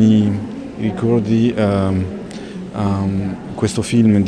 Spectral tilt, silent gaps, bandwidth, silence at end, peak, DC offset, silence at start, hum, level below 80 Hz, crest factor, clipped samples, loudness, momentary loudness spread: -7.5 dB/octave; none; 11 kHz; 0 s; -4 dBFS; under 0.1%; 0 s; none; -44 dBFS; 14 dB; under 0.1%; -18 LUFS; 13 LU